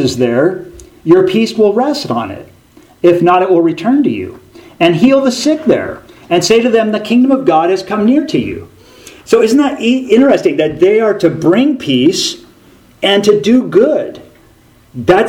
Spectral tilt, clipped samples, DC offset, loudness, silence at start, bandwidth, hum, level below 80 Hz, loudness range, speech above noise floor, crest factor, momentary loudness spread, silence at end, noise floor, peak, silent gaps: -5 dB/octave; 0.2%; under 0.1%; -11 LUFS; 0 s; 16 kHz; none; -48 dBFS; 2 LU; 35 dB; 12 dB; 10 LU; 0 s; -45 dBFS; 0 dBFS; none